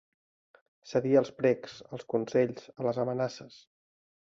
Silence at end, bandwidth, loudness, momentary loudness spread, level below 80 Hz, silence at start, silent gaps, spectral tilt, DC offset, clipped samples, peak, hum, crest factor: 0.85 s; 7.6 kHz; -30 LUFS; 12 LU; -72 dBFS; 0.85 s; none; -7 dB/octave; under 0.1%; under 0.1%; -12 dBFS; none; 20 dB